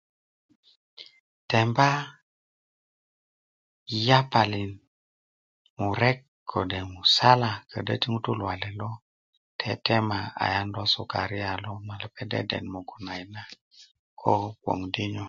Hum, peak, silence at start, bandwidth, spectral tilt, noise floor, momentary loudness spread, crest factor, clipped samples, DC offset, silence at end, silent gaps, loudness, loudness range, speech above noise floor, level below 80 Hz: none; -2 dBFS; 1 s; 7.6 kHz; -5.5 dB/octave; under -90 dBFS; 17 LU; 26 dB; under 0.1%; under 0.1%; 0 s; 1.20-1.48 s, 2.22-3.86 s, 4.87-5.76 s, 6.28-6.46 s, 9.02-9.59 s, 13.61-13.71 s, 13.99-14.17 s; -26 LUFS; 6 LU; over 64 dB; -54 dBFS